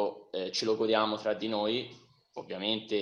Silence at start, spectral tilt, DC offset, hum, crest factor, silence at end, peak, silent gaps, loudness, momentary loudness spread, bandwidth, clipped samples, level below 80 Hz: 0 s; -4 dB/octave; under 0.1%; none; 20 dB; 0 s; -12 dBFS; none; -31 LUFS; 16 LU; 10.5 kHz; under 0.1%; -76 dBFS